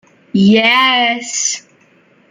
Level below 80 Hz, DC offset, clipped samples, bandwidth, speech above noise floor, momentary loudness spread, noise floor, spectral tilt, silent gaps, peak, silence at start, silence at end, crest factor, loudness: -58 dBFS; under 0.1%; under 0.1%; 9.6 kHz; 38 dB; 10 LU; -50 dBFS; -3 dB/octave; none; -2 dBFS; 0.35 s; 0.7 s; 14 dB; -12 LUFS